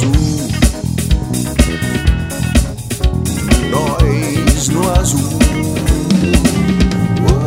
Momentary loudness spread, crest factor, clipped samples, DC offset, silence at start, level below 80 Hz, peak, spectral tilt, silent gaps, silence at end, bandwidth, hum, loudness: 4 LU; 12 dB; 0.1%; 0.3%; 0 s; -18 dBFS; 0 dBFS; -5.5 dB/octave; none; 0 s; 16.5 kHz; none; -14 LUFS